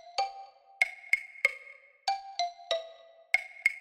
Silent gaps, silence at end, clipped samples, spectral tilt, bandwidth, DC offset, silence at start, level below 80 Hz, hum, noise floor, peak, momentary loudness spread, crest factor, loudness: none; 0 s; under 0.1%; 2.5 dB/octave; 16 kHz; under 0.1%; 0.05 s; -76 dBFS; none; -54 dBFS; -10 dBFS; 17 LU; 24 dB; -31 LUFS